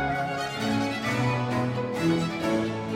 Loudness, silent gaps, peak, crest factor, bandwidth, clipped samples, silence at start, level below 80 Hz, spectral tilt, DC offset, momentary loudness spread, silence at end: -27 LUFS; none; -14 dBFS; 14 dB; 16 kHz; under 0.1%; 0 s; -52 dBFS; -6 dB/octave; under 0.1%; 3 LU; 0 s